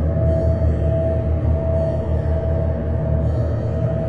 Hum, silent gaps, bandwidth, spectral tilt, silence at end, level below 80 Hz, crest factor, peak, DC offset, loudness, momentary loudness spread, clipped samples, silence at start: none; none; 4.6 kHz; -11 dB/octave; 0 s; -26 dBFS; 10 dB; -8 dBFS; 1%; -20 LUFS; 3 LU; under 0.1%; 0 s